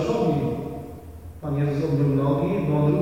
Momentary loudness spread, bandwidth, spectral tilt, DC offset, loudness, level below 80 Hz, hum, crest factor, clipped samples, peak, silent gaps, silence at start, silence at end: 17 LU; 8 kHz; -9 dB/octave; 0.2%; -23 LUFS; -46 dBFS; none; 14 dB; under 0.1%; -10 dBFS; none; 0 s; 0 s